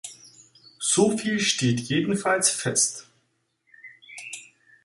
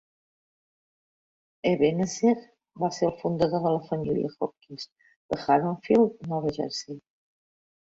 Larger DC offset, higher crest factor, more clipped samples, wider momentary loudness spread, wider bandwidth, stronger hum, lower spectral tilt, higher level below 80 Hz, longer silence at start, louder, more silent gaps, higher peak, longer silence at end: neither; about the same, 20 dB vs 20 dB; neither; first, 19 LU vs 15 LU; first, 11.5 kHz vs 8 kHz; neither; second, -3 dB/octave vs -6 dB/octave; about the same, -66 dBFS vs -62 dBFS; second, 0.05 s vs 1.65 s; first, -23 LUFS vs -27 LUFS; second, none vs 4.92-4.96 s, 5.16-5.29 s; about the same, -6 dBFS vs -8 dBFS; second, 0.4 s vs 0.85 s